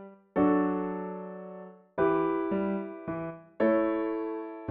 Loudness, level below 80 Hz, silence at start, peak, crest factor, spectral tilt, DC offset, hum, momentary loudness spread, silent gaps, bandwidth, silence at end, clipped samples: -30 LUFS; -62 dBFS; 0 s; -14 dBFS; 16 dB; -7.5 dB/octave; under 0.1%; none; 15 LU; none; 4.2 kHz; 0 s; under 0.1%